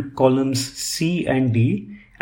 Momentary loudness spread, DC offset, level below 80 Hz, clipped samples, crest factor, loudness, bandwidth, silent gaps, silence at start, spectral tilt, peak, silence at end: 7 LU; under 0.1%; -52 dBFS; under 0.1%; 18 dB; -20 LUFS; 17 kHz; none; 0 s; -5.5 dB/octave; -2 dBFS; 0.25 s